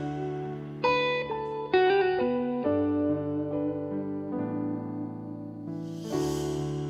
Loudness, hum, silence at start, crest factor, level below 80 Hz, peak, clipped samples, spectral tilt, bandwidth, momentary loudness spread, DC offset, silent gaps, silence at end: -29 LUFS; none; 0 s; 18 dB; -58 dBFS; -10 dBFS; under 0.1%; -6.5 dB/octave; 14 kHz; 12 LU; under 0.1%; none; 0 s